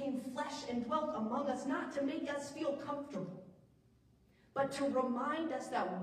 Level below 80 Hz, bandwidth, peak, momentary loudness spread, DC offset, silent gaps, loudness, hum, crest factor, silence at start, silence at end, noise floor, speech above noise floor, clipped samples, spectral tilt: -74 dBFS; 15 kHz; -22 dBFS; 7 LU; under 0.1%; none; -39 LUFS; none; 18 dB; 0 s; 0 s; -68 dBFS; 30 dB; under 0.1%; -5 dB/octave